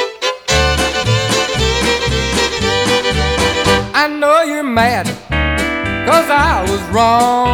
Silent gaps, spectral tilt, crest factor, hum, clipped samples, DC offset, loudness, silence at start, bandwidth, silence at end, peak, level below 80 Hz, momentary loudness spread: none; -4 dB/octave; 14 dB; none; under 0.1%; under 0.1%; -13 LUFS; 0 s; over 20 kHz; 0 s; 0 dBFS; -26 dBFS; 5 LU